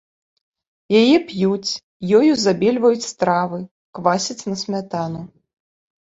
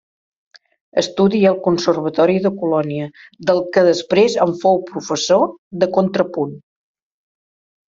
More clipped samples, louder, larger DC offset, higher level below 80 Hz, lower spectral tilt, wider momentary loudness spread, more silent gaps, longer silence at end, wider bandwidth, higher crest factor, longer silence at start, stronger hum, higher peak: neither; about the same, -18 LUFS vs -17 LUFS; neither; about the same, -60 dBFS vs -60 dBFS; about the same, -5 dB/octave vs -5.5 dB/octave; first, 12 LU vs 9 LU; first, 1.83-2.00 s, 3.71-3.93 s vs 5.58-5.71 s; second, 0.75 s vs 1.3 s; about the same, 8 kHz vs 7.6 kHz; about the same, 18 dB vs 16 dB; about the same, 0.9 s vs 0.95 s; neither; about the same, -2 dBFS vs -2 dBFS